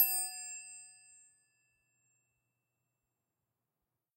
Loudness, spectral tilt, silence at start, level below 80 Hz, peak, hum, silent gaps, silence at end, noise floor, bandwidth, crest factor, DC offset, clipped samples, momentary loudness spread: -35 LUFS; 4.5 dB/octave; 0 s; under -90 dBFS; -14 dBFS; none; none; 3.25 s; -89 dBFS; 16 kHz; 28 dB; under 0.1%; under 0.1%; 24 LU